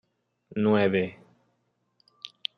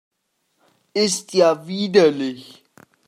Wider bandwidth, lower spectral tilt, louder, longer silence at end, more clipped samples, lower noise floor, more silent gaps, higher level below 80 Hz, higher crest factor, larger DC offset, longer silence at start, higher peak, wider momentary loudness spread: second, 6.4 kHz vs 16 kHz; first, -8 dB/octave vs -4 dB/octave; second, -26 LUFS vs -19 LUFS; second, 0.3 s vs 0.65 s; neither; about the same, -74 dBFS vs -71 dBFS; neither; about the same, -72 dBFS vs -72 dBFS; about the same, 20 dB vs 20 dB; neither; second, 0.55 s vs 0.95 s; second, -10 dBFS vs -2 dBFS; first, 21 LU vs 12 LU